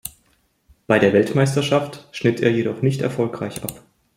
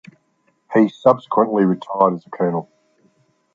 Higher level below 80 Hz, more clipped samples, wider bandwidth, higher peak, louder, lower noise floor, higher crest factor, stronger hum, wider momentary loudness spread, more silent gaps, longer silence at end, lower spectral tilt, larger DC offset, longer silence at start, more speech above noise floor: first, -56 dBFS vs -66 dBFS; neither; first, 16.5 kHz vs 7.4 kHz; about the same, -2 dBFS vs -2 dBFS; about the same, -20 LUFS vs -18 LUFS; about the same, -63 dBFS vs -64 dBFS; about the same, 18 dB vs 18 dB; neither; first, 15 LU vs 7 LU; neither; second, 0.4 s vs 0.95 s; second, -6 dB/octave vs -9 dB/octave; neither; second, 0.05 s vs 0.7 s; about the same, 44 dB vs 47 dB